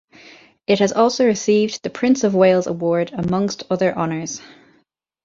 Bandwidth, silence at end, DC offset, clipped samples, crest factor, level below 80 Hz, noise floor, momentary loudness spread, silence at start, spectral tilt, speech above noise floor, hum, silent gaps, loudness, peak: 7.8 kHz; 0.8 s; under 0.1%; under 0.1%; 16 dB; -56 dBFS; -62 dBFS; 8 LU; 0.7 s; -5 dB/octave; 45 dB; none; none; -18 LUFS; -2 dBFS